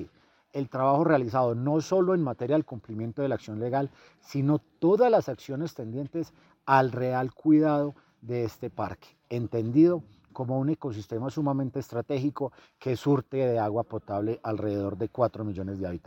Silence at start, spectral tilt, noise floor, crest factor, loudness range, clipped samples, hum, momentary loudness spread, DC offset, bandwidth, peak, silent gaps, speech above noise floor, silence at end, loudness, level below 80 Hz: 0 s; -8.5 dB/octave; -58 dBFS; 20 dB; 3 LU; under 0.1%; none; 13 LU; under 0.1%; 16.5 kHz; -8 dBFS; none; 31 dB; 0.1 s; -28 LUFS; -64 dBFS